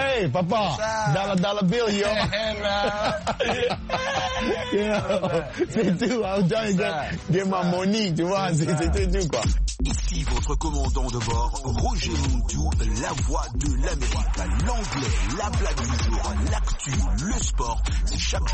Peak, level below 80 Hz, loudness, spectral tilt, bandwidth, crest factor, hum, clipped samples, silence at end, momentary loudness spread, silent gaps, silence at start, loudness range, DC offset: -10 dBFS; -28 dBFS; -25 LUFS; -5 dB/octave; 8.8 kHz; 12 dB; none; under 0.1%; 0 s; 4 LU; none; 0 s; 2 LU; under 0.1%